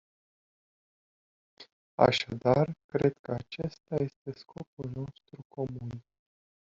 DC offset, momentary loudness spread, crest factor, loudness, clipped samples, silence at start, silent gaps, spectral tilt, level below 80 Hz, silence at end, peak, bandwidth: under 0.1%; 19 LU; 26 dB; -31 LUFS; under 0.1%; 1.6 s; 1.72-1.98 s, 2.84-2.89 s, 3.19-3.24 s, 4.16-4.25 s, 4.67-4.77 s, 5.45-5.50 s; -5 dB/octave; -64 dBFS; 0.75 s; -6 dBFS; 7.6 kHz